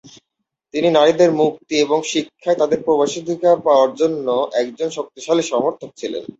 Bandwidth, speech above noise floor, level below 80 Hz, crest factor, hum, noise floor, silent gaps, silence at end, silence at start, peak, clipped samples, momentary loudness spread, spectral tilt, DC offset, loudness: 8 kHz; 60 dB; -64 dBFS; 16 dB; none; -78 dBFS; none; 0.15 s; 0.05 s; -2 dBFS; under 0.1%; 11 LU; -4.5 dB/octave; under 0.1%; -17 LUFS